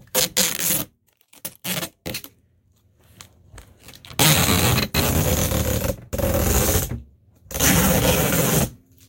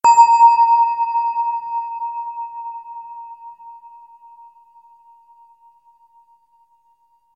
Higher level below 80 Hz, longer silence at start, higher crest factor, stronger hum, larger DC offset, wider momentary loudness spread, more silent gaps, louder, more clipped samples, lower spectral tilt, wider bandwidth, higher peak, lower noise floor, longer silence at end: first, -34 dBFS vs -74 dBFS; about the same, 0.15 s vs 0.05 s; about the same, 22 dB vs 18 dB; neither; neither; second, 15 LU vs 26 LU; neither; second, -19 LUFS vs -16 LUFS; neither; first, -3.5 dB/octave vs 0 dB/octave; first, 17.5 kHz vs 8.2 kHz; about the same, 0 dBFS vs 0 dBFS; about the same, -60 dBFS vs -60 dBFS; second, 0.35 s vs 3.45 s